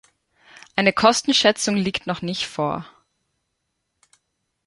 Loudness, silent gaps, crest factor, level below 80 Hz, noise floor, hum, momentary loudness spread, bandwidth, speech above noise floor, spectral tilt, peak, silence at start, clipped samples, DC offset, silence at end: -20 LUFS; none; 22 dB; -58 dBFS; -76 dBFS; none; 10 LU; 11.5 kHz; 56 dB; -3.5 dB/octave; -2 dBFS; 0.75 s; under 0.1%; under 0.1%; 1.8 s